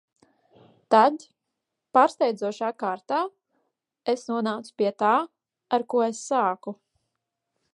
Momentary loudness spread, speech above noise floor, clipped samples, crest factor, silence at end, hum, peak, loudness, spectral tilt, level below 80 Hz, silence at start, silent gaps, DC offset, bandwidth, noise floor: 14 LU; 59 dB; under 0.1%; 22 dB; 1 s; none; -4 dBFS; -25 LUFS; -4.5 dB/octave; -84 dBFS; 0.9 s; none; under 0.1%; 11.5 kHz; -83 dBFS